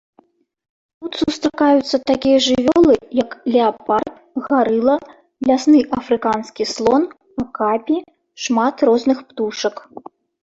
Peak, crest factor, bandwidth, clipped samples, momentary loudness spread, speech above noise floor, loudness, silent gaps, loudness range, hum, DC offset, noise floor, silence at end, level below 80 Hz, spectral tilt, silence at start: -2 dBFS; 16 dB; 8 kHz; under 0.1%; 11 LU; 40 dB; -17 LUFS; none; 3 LU; none; under 0.1%; -56 dBFS; 0.65 s; -50 dBFS; -4.5 dB/octave; 1 s